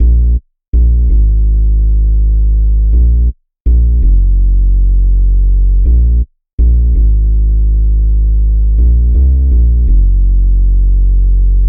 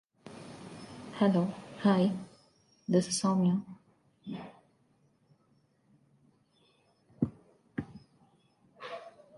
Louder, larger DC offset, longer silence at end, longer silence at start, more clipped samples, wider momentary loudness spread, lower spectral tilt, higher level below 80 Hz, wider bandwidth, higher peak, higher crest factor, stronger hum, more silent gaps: first, -12 LUFS vs -32 LUFS; neither; second, 0 s vs 0.3 s; second, 0 s vs 0.25 s; neither; second, 3 LU vs 22 LU; first, -15 dB/octave vs -6 dB/octave; first, -8 dBFS vs -68 dBFS; second, 0.6 kHz vs 11.5 kHz; first, -2 dBFS vs -14 dBFS; second, 6 dB vs 20 dB; first, 50 Hz at -35 dBFS vs none; first, 0.68-0.73 s, 3.60-3.65 s, 6.53-6.58 s vs none